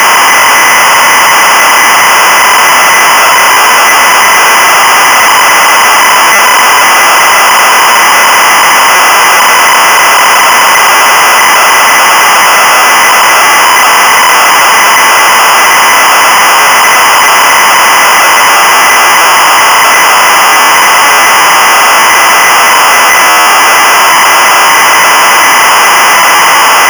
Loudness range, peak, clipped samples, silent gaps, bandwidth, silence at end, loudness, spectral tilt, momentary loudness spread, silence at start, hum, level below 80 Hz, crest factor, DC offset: 0 LU; -4 dBFS; under 0.1%; none; over 20 kHz; 0 s; -2 LUFS; 1 dB/octave; 0 LU; 0 s; none; -48 dBFS; 0 dB; under 0.1%